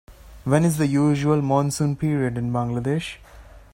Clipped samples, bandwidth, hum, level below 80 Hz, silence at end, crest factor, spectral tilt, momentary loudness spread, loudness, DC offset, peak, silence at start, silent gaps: under 0.1%; 16.5 kHz; none; -48 dBFS; 0.15 s; 18 dB; -6.5 dB/octave; 8 LU; -22 LUFS; under 0.1%; -4 dBFS; 0.1 s; none